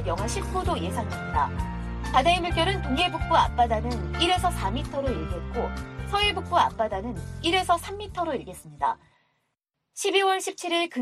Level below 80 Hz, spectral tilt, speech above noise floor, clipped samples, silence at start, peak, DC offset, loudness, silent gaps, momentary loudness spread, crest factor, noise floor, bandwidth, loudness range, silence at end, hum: -36 dBFS; -4.5 dB/octave; 54 dB; under 0.1%; 0 s; -8 dBFS; under 0.1%; -26 LUFS; none; 10 LU; 18 dB; -79 dBFS; 14.5 kHz; 4 LU; 0 s; none